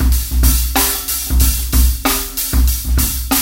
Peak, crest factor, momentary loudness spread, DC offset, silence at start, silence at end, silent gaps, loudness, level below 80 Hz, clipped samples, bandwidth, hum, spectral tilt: 0 dBFS; 14 dB; 3 LU; under 0.1%; 0 s; 0 s; none; -15 LUFS; -16 dBFS; under 0.1%; 17 kHz; none; -3.5 dB/octave